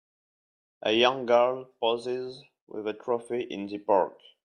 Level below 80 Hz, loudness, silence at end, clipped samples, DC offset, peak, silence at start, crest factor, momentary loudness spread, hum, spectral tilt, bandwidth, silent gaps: -76 dBFS; -28 LUFS; 0.35 s; under 0.1%; under 0.1%; -8 dBFS; 0.85 s; 20 dB; 12 LU; none; -4.5 dB/octave; 9.8 kHz; 2.61-2.67 s